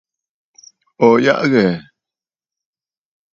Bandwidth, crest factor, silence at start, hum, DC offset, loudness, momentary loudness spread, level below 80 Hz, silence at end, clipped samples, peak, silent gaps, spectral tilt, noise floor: 7.4 kHz; 18 dB; 1 s; none; under 0.1%; -14 LUFS; 7 LU; -60 dBFS; 1.5 s; under 0.1%; 0 dBFS; none; -6.5 dB/octave; -89 dBFS